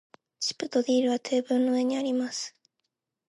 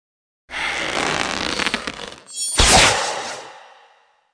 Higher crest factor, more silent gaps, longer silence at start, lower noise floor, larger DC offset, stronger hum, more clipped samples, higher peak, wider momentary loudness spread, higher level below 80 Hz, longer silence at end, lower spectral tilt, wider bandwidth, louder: about the same, 16 dB vs 20 dB; neither; about the same, 0.4 s vs 0.5 s; first, -82 dBFS vs -56 dBFS; neither; neither; neither; second, -14 dBFS vs 0 dBFS; second, 8 LU vs 19 LU; second, -82 dBFS vs -32 dBFS; about the same, 0.8 s vs 0.7 s; first, -3 dB/octave vs -1.5 dB/octave; about the same, 11.5 kHz vs 10.5 kHz; second, -27 LUFS vs -17 LUFS